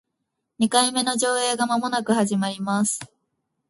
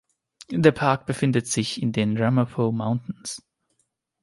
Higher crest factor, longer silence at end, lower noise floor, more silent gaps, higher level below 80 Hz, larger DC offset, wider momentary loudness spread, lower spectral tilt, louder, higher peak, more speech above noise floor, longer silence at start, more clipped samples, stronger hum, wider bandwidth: about the same, 22 dB vs 22 dB; second, 0.65 s vs 0.85 s; first, -79 dBFS vs -73 dBFS; neither; second, -68 dBFS vs -58 dBFS; neither; second, 6 LU vs 13 LU; second, -3 dB/octave vs -5.5 dB/octave; about the same, -22 LUFS vs -23 LUFS; about the same, -2 dBFS vs -2 dBFS; first, 57 dB vs 50 dB; about the same, 0.6 s vs 0.5 s; neither; neither; about the same, 12 kHz vs 11.5 kHz